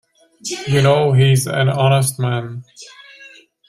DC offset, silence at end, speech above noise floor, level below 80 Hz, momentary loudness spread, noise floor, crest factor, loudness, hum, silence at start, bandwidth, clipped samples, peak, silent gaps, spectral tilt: under 0.1%; 0.4 s; 29 dB; -52 dBFS; 16 LU; -44 dBFS; 16 dB; -16 LUFS; none; 0.45 s; 14.5 kHz; under 0.1%; -2 dBFS; none; -5.5 dB/octave